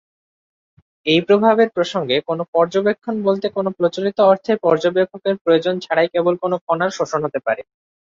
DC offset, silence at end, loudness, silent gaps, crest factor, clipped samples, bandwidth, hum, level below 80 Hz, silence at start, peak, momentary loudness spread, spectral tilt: under 0.1%; 0.5 s; -18 LUFS; 2.48-2.53 s, 5.41-5.45 s, 6.61-6.67 s; 16 dB; under 0.1%; 7.6 kHz; none; -64 dBFS; 1.05 s; -2 dBFS; 7 LU; -5.5 dB/octave